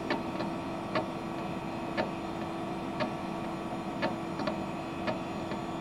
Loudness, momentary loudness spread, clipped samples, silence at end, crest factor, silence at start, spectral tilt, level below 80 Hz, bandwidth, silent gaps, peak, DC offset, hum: -35 LUFS; 3 LU; under 0.1%; 0 s; 18 dB; 0 s; -6 dB/octave; -58 dBFS; 15.5 kHz; none; -18 dBFS; under 0.1%; none